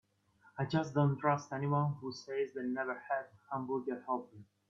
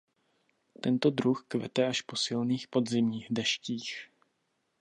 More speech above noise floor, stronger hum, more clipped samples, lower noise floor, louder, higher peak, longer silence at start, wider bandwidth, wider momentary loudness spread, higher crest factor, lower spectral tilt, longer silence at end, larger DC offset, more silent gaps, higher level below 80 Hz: second, 32 dB vs 48 dB; neither; neither; second, -68 dBFS vs -78 dBFS; second, -36 LUFS vs -31 LUFS; second, -16 dBFS vs -12 dBFS; second, 0.55 s vs 0.85 s; second, 7.2 kHz vs 10.5 kHz; about the same, 10 LU vs 9 LU; about the same, 20 dB vs 20 dB; first, -7.5 dB/octave vs -4.5 dB/octave; second, 0.25 s vs 0.75 s; neither; neither; about the same, -76 dBFS vs -76 dBFS